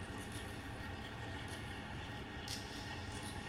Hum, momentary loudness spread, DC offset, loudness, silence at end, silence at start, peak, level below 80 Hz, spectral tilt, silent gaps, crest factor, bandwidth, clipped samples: none; 2 LU; under 0.1%; -46 LUFS; 0 s; 0 s; -26 dBFS; -56 dBFS; -4 dB/octave; none; 20 dB; 16 kHz; under 0.1%